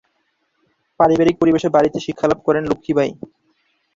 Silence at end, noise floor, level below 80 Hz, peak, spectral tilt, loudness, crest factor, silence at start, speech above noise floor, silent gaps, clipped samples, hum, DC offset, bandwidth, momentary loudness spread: 0.8 s; -68 dBFS; -50 dBFS; -2 dBFS; -6.5 dB/octave; -17 LUFS; 18 dB; 1 s; 51 dB; none; under 0.1%; none; under 0.1%; 7.6 kHz; 6 LU